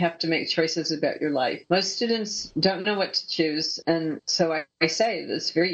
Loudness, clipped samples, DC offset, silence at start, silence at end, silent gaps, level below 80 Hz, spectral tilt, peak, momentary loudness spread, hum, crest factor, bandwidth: -25 LUFS; under 0.1%; under 0.1%; 0 s; 0 s; none; -68 dBFS; -3.5 dB/octave; -6 dBFS; 3 LU; none; 20 dB; 8.4 kHz